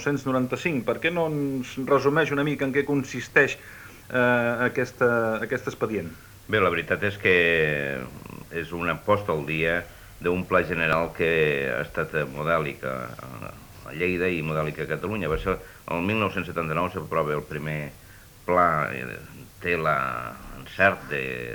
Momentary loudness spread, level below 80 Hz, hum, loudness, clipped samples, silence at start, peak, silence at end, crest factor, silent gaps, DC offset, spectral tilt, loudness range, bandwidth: 15 LU; -50 dBFS; none; -25 LUFS; under 0.1%; 0 s; -6 dBFS; 0 s; 20 dB; none; under 0.1%; -6 dB/octave; 4 LU; over 20 kHz